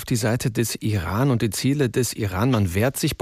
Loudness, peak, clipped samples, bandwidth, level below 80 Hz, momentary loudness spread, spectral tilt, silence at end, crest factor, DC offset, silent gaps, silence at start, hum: -22 LUFS; -8 dBFS; under 0.1%; 16 kHz; -48 dBFS; 3 LU; -5.5 dB/octave; 0.05 s; 12 dB; under 0.1%; none; 0 s; none